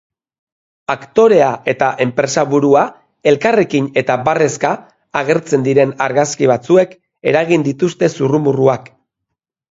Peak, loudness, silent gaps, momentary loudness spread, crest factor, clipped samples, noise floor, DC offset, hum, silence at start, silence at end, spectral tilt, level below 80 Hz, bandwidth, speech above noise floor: 0 dBFS; -14 LUFS; none; 9 LU; 14 dB; under 0.1%; -78 dBFS; under 0.1%; none; 0.9 s; 0.9 s; -5.5 dB/octave; -58 dBFS; 7.8 kHz; 64 dB